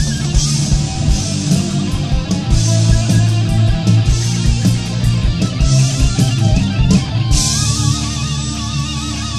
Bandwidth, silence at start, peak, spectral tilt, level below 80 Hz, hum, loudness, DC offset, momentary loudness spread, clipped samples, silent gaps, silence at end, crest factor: 13 kHz; 0 s; 0 dBFS; -5 dB/octave; -20 dBFS; none; -15 LUFS; 0.8%; 6 LU; under 0.1%; none; 0 s; 14 dB